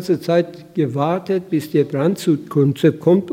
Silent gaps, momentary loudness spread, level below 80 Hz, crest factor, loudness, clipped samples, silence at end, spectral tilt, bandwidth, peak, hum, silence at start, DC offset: none; 6 LU; -64 dBFS; 16 dB; -18 LUFS; under 0.1%; 0 s; -7.5 dB/octave; 16.5 kHz; -2 dBFS; none; 0 s; under 0.1%